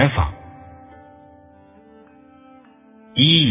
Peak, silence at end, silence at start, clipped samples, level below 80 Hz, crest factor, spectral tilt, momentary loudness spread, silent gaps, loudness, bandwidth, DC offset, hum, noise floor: 0 dBFS; 0 s; 0 s; under 0.1%; -36 dBFS; 22 dB; -10 dB/octave; 29 LU; none; -17 LUFS; 3.9 kHz; under 0.1%; none; -49 dBFS